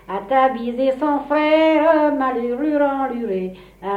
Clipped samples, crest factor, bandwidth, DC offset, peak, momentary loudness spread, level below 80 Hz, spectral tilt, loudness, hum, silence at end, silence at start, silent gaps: under 0.1%; 14 dB; 5.4 kHz; under 0.1%; -4 dBFS; 10 LU; -52 dBFS; -7 dB/octave; -18 LUFS; none; 0 s; 0.1 s; none